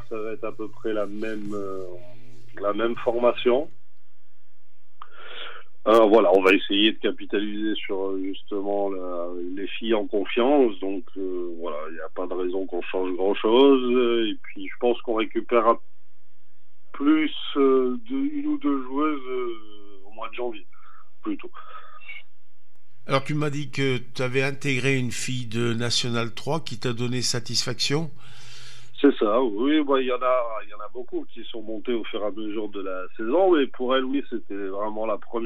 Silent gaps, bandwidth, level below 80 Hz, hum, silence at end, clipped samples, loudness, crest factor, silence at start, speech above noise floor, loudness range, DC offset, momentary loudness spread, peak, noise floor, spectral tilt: none; 13.5 kHz; -72 dBFS; none; 0 s; under 0.1%; -24 LUFS; 20 dB; 0 s; 48 dB; 8 LU; 4%; 17 LU; -4 dBFS; -72 dBFS; -5 dB/octave